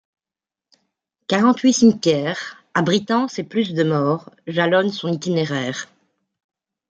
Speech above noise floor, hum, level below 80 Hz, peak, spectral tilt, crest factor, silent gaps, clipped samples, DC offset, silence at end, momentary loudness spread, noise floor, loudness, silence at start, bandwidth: 71 dB; none; -66 dBFS; -2 dBFS; -5 dB/octave; 18 dB; none; under 0.1%; under 0.1%; 1.05 s; 12 LU; -90 dBFS; -19 LUFS; 1.3 s; 9 kHz